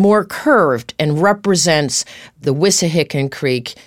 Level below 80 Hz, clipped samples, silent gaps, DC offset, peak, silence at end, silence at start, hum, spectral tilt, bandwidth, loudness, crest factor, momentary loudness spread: -56 dBFS; under 0.1%; none; 0.2%; 0 dBFS; 0.15 s; 0 s; none; -4 dB/octave; 17 kHz; -15 LUFS; 14 dB; 7 LU